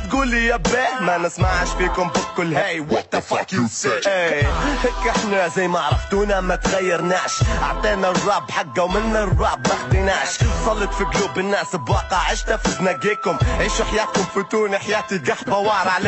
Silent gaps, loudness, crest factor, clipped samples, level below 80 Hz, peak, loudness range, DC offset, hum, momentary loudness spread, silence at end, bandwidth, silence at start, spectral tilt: none; -20 LUFS; 12 dB; under 0.1%; -28 dBFS; -6 dBFS; 1 LU; under 0.1%; none; 3 LU; 0 s; 8.4 kHz; 0 s; -4.5 dB/octave